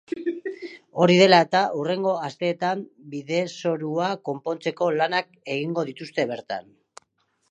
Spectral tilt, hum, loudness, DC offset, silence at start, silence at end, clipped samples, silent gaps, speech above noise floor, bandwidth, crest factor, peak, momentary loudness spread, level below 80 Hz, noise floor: -5.5 dB/octave; none; -23 LUFS; under 0.1%; 0.1 s; 0.9 s; under 0.1%; none; 47 dB; 9.6 kHz; 22 dB; -2 dBFS; 17 LU; -76 dBFS; -70 dBFS